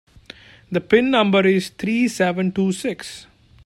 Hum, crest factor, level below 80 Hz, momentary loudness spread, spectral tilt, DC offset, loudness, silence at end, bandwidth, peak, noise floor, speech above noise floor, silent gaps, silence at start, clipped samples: none; 18 dB; -56 dBFS; 13 LU; -5.5 dB/octave; under 0.1%; -19 LUFS; 0.4 s; 13 kHz; -2 dBFS; -44 dBFS; 26 dB; none; 0.7 s; under 0.1%